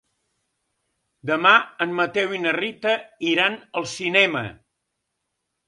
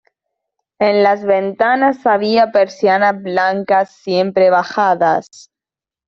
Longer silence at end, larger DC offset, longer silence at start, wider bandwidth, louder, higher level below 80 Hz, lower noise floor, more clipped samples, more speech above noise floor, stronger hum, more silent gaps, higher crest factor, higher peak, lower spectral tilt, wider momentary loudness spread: first, 1.15 s vs 0.85 s; neither; first, 1.25 s vs 0.8 s; first, 11.5 kHz vs 7.6 kHz; second, -21 LUFS vs -14 LUFS; about the same, -66 dBFS vs -62 dBFS; second, -78 dBFS vs -89 dBFS; neither; second, 57 dB vs 75 dB; neither; neither; first, 22 dB vs 14 dB; about the same, 0 dBFS vs -2 dBFS; second, -3.5 dB/octave vs -5.5 dB/octave; first, 13 LU vs 4 LU